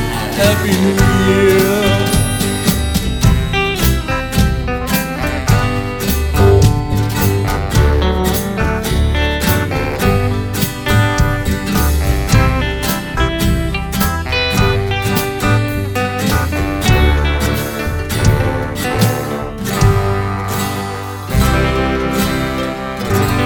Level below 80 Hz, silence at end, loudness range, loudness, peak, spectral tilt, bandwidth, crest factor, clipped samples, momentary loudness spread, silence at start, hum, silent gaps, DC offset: -20 dBFS; 0 s; 3 LU; -15 LUFS; 0 dBFS; -5.5 dB/octave; over 20 kHz; 14 dB; under 0.1%; 6 LU; 0 s; none; none; under 0.1%